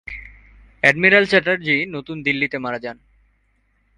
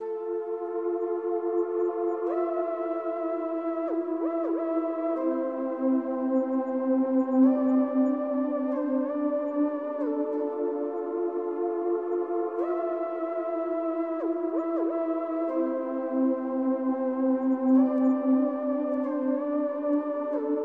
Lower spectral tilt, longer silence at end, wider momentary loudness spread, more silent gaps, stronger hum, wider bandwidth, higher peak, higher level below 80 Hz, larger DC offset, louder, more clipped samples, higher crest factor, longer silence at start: second, -5 dB/octave vs -9 dB/octave; first, 1.05 s vs 0 s; first, 19 LU vs 6 LU; neither; neither; first, 11.5 kHz vs 3.2 kHz; first, 0 dBFS vs -12 dBFS; first, -50 dBFS vs -82 dBFS; neither; first, -17 LUFS vs -28 LUFS; neither; first, 20 dB vs 14 dB; about the same, 0.05 s vs 0 s